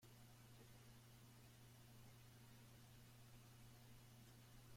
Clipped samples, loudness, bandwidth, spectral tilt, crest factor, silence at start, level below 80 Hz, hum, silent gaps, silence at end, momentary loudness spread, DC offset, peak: under 0.1%; -66 LUFS; 16.5 kHz; -4.5 dB/octave; 12 dB; 0 s; -76 dBFS; none; none; 0 s; 1 LU; under 0.1%; -52 dBFS